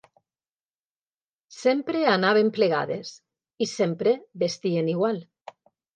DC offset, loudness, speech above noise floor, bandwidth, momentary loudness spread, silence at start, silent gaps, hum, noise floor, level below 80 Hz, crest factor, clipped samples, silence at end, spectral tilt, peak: under 0.1%; -24 LUFS; over 66 dB; 9.2 kHz; 10 LU; 1.5 s; none; none; under -90 dBFS; -78 dBFS; 20 dB; under 0.1%; 0.7 s; -5.5 dB/octave; -6 dBFS